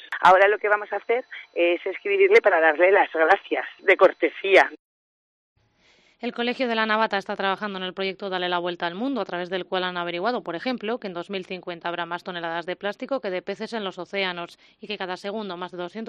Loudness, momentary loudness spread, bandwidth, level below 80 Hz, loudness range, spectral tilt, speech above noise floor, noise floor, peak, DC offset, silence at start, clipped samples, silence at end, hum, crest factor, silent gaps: -23 LUFS; 14 LU; 10 kHz; -72 dBFS; 11 LU; -5 dB/octave; 38 dB; -61 dBFS; -4 dBFS; under 0.1%; 0 s; under 0.1%; 0 s; none; 18 dB; 4.79-5.56 s